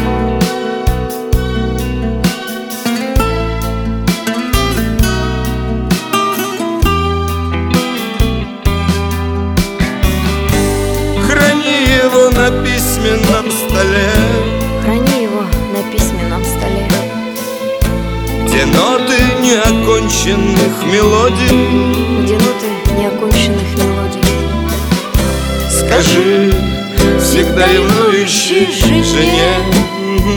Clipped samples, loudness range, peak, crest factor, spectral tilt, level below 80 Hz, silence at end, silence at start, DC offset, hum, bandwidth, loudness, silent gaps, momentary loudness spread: under 0.1%; 5 LU; 0 dBFS; 12 dB; -4.5 dB/octave; -20 dBFS; 0 s; 0 s; under 0.1%; none; 20 kHz; -13 LUFS; none; 7 LU